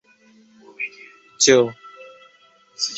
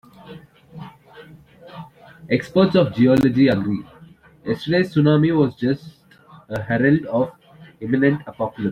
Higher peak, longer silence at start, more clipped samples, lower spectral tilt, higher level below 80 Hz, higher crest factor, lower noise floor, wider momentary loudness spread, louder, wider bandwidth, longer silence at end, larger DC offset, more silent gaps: about the same, -2 dBFS vs -4 dBFS; first, 0.8 s vs 0.25 s; neither; second, -2 dB/octave vs -8.5 dB/octave; second, -66 dBFS vs -54 dBFS; first, 22 dB vs 16 dB; first, -55 dBFS vs -48 dBFS; about the same, 24 LU vs 23 LU; about the same, -19 LUFS vs -19 LUFS; second, 8.2 kHz vs 11.5 kHz; about the same, 0 s vs 0 s; neither; neither